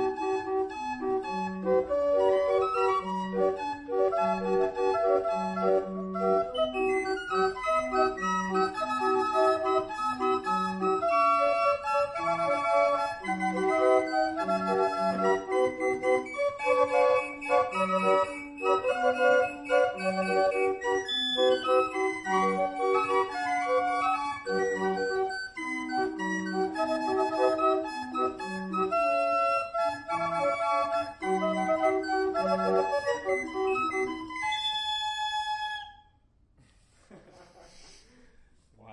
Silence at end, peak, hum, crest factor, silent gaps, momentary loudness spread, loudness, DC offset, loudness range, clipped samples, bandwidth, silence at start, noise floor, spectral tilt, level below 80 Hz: 0 s; -12 dBFS; none; 16 dB; none; 6 LU; -28 LUFS; under 0.1%; 4 LU; under 0.1%; 11 kHz; 0 s; -64 dBFS; -4.5 dB/octave; -60 dBFS